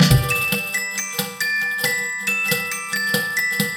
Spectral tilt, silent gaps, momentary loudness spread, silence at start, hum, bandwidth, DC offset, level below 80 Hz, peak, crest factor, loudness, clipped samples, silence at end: -3.5 dB/octave; none; 5 LU; 0 s; none; 19 kHz; under 0.1%; -38 dBFS; -2 dBFS; 18 dB; -20 LUFS; under 0.1%; 0 s